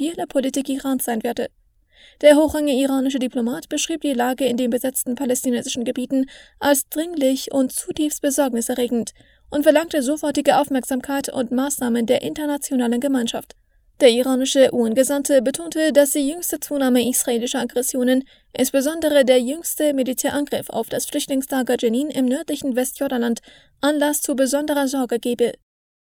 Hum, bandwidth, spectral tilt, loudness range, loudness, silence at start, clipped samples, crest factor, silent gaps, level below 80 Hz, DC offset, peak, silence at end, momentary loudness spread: none; 20 kHz; -3 dB/octave; 4 LU; -20 LUFS; 0 s; under 0.1%; 20 dB; none; -56 dBFS; under 0.1%; 0 dBFS; 0.65 s; 8 LU